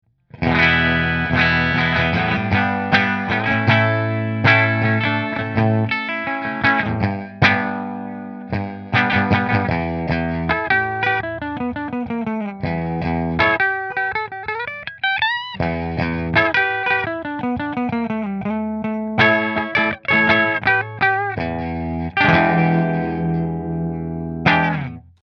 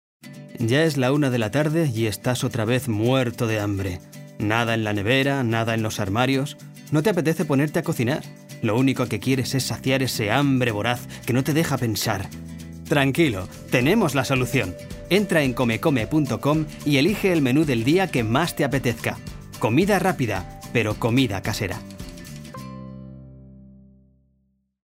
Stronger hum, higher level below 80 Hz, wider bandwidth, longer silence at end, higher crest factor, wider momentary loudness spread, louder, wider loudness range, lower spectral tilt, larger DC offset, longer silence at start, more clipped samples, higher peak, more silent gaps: neither; first, -42 dBFS vs -48 dBFS; second, 6.4 kHz vs 16 kHz; second, 0.25 s vs 1.35 s; about the same, 20 dB vs 18 dB; second, 10 LU vs 17 LU; first, -19 LUFS vs -22 LUFS; about the same, 4 LU vs 3 LU; first, -7.5 dB/octave vs -5.5 dB/octave; neither; about the same, 0.35 s vs 0.25 s; neither; first, 0 dBFS vs -4 dBFS; neither